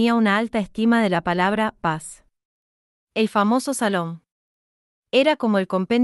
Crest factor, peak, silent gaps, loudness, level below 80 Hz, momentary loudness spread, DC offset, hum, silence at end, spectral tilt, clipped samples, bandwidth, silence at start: 16 dB; -6 dBFS; 2.45-3.07 s, 4.32-5.03 s; -21 LUFS; -58 dBFS; 10 LU; under 0.1%; none; 0 s; -5 dB/octave; under 0.1%; 12 kHz; 0 s